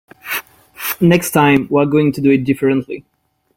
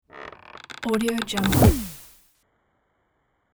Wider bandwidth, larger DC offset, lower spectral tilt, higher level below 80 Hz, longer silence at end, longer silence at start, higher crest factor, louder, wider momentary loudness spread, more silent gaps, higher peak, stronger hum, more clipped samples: second, 17 kHz vs over 20 kHz; neither; about the same, -6 dB/octave vs -5.5 dB/octave; second, -52 dBFS vs -36 dBFS; second, 0.55 s vs 1.55 s; about the same, 0.25 s vs 0.15 s; second, 16 dB vs 22 dB; first, -15 LUFS vs -22 LUFS; second, 12 LU vs 24 LU; neither; first, 0 dBFS vs -4 dBFS; neither; neither